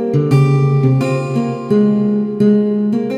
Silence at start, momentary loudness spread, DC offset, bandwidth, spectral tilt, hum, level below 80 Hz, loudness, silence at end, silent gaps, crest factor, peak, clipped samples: 0 s; 5 LU; under 0.1%; 9 kHz; -9 dB/octave; none; -52 dBFS; -14 LUFS; 0 s; none; 12 dB; -2 dBFS; under 0.1%